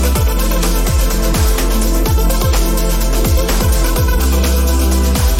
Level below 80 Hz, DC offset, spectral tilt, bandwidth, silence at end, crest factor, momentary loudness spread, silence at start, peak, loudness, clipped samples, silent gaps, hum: -14 dBFS; under 0.1%; -4.5 dB/octave; 17 kHz; 0 s; 10 dB; 2 LU; 0 s; -2 dBFS; -15 LUFS; under 0.1%; none; none